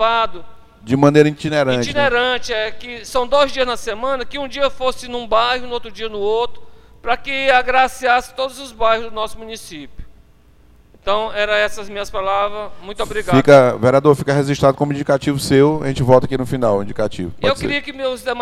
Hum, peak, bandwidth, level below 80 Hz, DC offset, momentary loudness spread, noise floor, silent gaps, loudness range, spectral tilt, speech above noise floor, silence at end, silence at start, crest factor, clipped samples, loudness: none; 0 dBFS; 15 kHz; -40 dBFS; under 0.1%; 12 LU; -49 dBFS; none; 8 LU; -5.5 dB/octave; 33 dB; 0 s; 0 s; 16 dB; under 0.1%; -17 LUFS